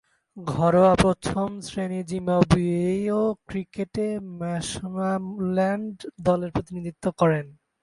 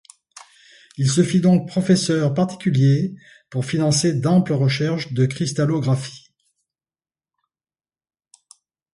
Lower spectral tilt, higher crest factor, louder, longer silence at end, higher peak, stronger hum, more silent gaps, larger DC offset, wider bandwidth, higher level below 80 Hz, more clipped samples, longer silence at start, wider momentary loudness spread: about the same, -6.5 dB/octave vs -6 dB/octave; first, 22 dB vs 16 dB; second, -24 LUFS vs -19 LUFS; second, 0.3 s vs 2.75 s; about the same, -4 dBFS vs -4 dBFS; neither; neither; neither; about the same, 11.5 kHz vs 11.5 kHz; first, -46 dBFS vs -58 dBFS; neither; second, 0.35 s vs 1 s; first, 12 LU vs 7 LU